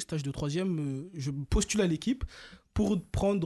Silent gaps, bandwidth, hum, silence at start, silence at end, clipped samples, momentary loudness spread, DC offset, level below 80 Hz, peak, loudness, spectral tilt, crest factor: none; 12.5 kHz; none; 0 s; 0 s; under 0.1%; 8 LU; under 0.1%; -40 dBFS; -16 dBFS; -31 LUFS; -5.5 dB/octave; 16 dB